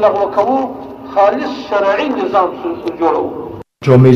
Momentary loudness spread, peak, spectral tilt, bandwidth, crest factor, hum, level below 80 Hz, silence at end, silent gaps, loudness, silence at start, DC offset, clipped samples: 10 LU; 0 dBFS; -8.5 dB/octave; 6.8 kHz; 14 dB; none; -50 dBFS; 0 s; none; -15 LUFS; 0 s; under 0.1%; under 0.1%